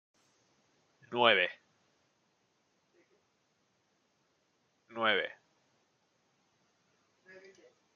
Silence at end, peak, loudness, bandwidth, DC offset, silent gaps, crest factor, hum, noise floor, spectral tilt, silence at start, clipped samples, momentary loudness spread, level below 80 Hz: 2.65 s; -10 dBFS; -30 LUFS; 7.2 kHz; under 0.1%; none; 30 dB; none; -76 dBFS; 0.5 dB/octave; 1.1 s; under 0.1%; 16 LU; -90 dBFS